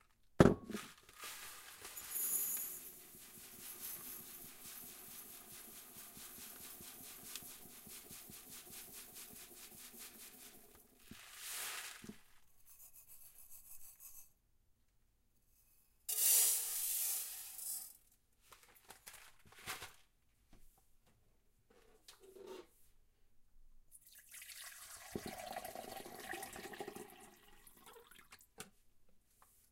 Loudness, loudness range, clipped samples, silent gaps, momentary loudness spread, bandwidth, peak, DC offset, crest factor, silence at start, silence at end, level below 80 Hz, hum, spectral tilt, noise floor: -41 LUFS; 23 LU; under 0.1%; none; 23 LU; 16 kHz; -10 dBFS; under 0.1%; 34 dB; 0.35 s; 0.55 s; -66 dBFS; none; -3 dB/octave; -75 dBFS